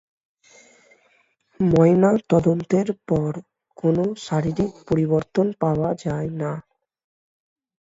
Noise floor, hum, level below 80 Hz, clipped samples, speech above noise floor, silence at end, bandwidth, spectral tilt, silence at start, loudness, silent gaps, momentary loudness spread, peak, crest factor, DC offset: -63 dBFS; none; -50 dBFS; under 0.1%; 43 dB; 1.2 s; 7.8 kHz; -8.5 dB/octave; 1.6 s; -21 LUFS; none; 11 LU; -4 dBFS; 18 dB; under 0.1%